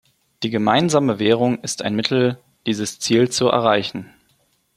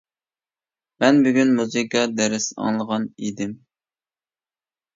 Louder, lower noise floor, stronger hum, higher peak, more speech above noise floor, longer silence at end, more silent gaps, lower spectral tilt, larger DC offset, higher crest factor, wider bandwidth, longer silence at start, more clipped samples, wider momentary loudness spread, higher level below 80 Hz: about the same, -19 LUFS vs -21 LUFS; second, -63 dBFS vs under -90 dBFS; neither; about the same, 0 dBFS vs -2 dBFS; second, 45 dB vs over 70 dB; second, 0.7 s vs 1.4 s; neither; about the same, -4.5 dB/octave vs -4 dB/octave; neither; about the same, 20 dB vs 22 dB; first, 15 kHz vs 7.8 kHz; second, 0.4 s vs 1 s; neither; about the same, 10 LU vs 12 LU; first, -60 dBFS vs -68 dBFS